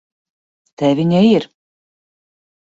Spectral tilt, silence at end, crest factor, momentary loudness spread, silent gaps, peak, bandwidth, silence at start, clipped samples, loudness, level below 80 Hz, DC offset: -8 dB/octave; 1.25 s; 16 dB; 9 LU; none; -2 dBFS; 7.8 kHz; 0.8 s; under 0.1%; -15 LUFS; -58 dBFS; under 0.1%